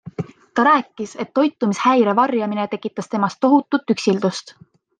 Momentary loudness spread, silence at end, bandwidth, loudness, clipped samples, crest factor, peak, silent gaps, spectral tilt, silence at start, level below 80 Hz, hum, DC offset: 13 LU; 0.5 s; 9.4 kHz; -19 LUFS; under 0.1%; 16 dB; -4 dBFS; none; -5.5 dB/octave; 0.05 s; -68 dBFS; none; under 0.1%